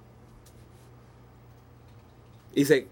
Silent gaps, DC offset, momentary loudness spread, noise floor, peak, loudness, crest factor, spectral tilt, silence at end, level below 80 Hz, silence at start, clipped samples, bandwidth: none; under 0.1%; 30 LU; -53 dBFS; -6 dBFS; -26 LUFS; 26 dB; -5 dB/octave; 0.05 s; -60 dBFS; 2.55 s; under 0.1%; 17 kHz